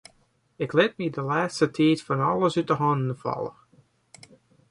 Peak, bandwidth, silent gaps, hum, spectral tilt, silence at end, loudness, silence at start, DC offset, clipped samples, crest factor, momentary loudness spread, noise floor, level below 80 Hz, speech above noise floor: -6 dBFS; 11.5 kHz; none; none; -6.5 dB/octave; 1.2 s; -25 LUFS; 0.6 s; under 0.1%; under 0.1%; 20 dB; 9 LU; -65 dBFS; -66 dBFS; 41 dB